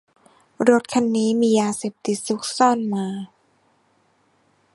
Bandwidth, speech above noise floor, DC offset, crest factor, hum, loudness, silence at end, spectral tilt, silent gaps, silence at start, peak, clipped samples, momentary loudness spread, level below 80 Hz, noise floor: 11.5 kHz; 43 dB; under 0.1%; 20 dB; none; -20 LUFS; 1.5 s; -4.5 dB/octave; none; 0.6 s; -2 dBFS; under 0.1%; 9 LU; -68 dBFS; -63 dBFS